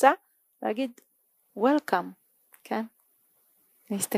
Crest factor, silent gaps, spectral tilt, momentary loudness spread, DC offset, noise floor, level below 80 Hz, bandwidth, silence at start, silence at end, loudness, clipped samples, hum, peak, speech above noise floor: 26 dB; none; -4 dB/octave; 16 LU; under 0.1%; -69 dBFS; -88 dBFS; 15.5 kHz; 0 s; 0 s; -29 LUFS; under 0.1%; none; -4 dBFS; 41 dB